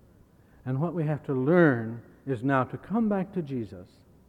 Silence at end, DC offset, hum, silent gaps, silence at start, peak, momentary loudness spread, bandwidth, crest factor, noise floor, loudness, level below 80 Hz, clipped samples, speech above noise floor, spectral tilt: 0.45 s; under 0.1%; none; none; 0.65 s; -8 dBFS; 18 LU; 5.2 kHz; 20 dB; -57 dBFS; -27 LUFS; -62 dBFS; under 0.1%; 31 dB; -10 dB/octave